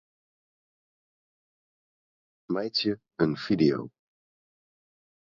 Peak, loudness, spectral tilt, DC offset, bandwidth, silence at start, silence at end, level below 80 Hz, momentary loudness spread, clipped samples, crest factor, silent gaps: -10 dBFS; -28 LUFS; -7 dB/octave; under 0.1%; 7.2 kHz; 2.5 s; 1.5 s; -66 dBFS; 10 LU; under 0.1%; 22 dB; none